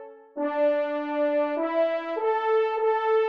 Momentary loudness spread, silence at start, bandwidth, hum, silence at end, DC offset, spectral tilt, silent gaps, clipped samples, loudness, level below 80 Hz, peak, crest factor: 5 LU; 0 s; 5.6 kHz; none; 0 s; under 0.1%; -4 dB/octave; none; under 0.1%; -25 LUFS; -82 dBFS; -14 dBFS; 12 dB